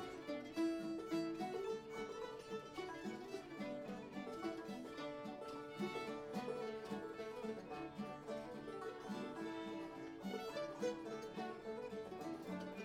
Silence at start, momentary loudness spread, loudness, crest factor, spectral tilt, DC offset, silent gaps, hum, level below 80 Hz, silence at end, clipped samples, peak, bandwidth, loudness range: 0 s; 6 LU; -47 LUFS; 16 dB; -5.5 dB/octave; under 0.1%; none; none; -76 dBFS; 0 s; under 0.1%; -30 dBFS; 16 kHz; 3 LU